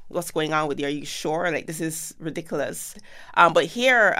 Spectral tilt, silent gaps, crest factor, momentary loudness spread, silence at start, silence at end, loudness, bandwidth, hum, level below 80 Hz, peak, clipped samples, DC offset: -3.5 dB/octave; none; 22 dB; 14 LU; 0 s; 0 s; -23 LUFS; 16 kHz; none; -54 dBFS; -2 dBFS; under 0.1%; under 0.1%